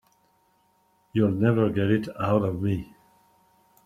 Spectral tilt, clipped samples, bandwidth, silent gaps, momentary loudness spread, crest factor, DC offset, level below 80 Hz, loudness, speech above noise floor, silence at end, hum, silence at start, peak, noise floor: -9 dB/octave; under 0.1%; 13 kHz; none; 9 LU; 20 dB; under 0.1%; -58 dBFS; -25 LUFS; 42 dB; 1 s; none; 1.15 s; -6 dBFS; -66 dBFS